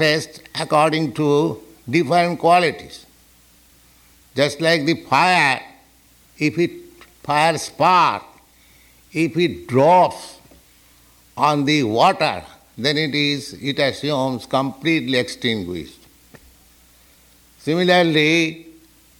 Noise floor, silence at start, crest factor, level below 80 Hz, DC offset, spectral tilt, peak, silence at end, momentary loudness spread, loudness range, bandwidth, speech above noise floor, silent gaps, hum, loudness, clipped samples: -53 dBFS; 0 s; 16 dB; -58 dBFS; under 0.1%; -5 dB/octave; -4 dBFS; 0.5 s; 15 LU; 4 LU; 19.5 kHz; 35 dB; none; none; -18 LUFS; under 0.1%